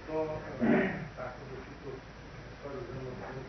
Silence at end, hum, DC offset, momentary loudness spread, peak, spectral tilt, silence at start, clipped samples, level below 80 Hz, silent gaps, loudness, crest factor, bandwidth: 0 s; none; under 0.1%; 18 LU; -16 dBFS; -7.5 dB/octave; 0 s; under 0.1%; -54 dBFS; none; -36 LUFS; 20 dB; 6.4 kHz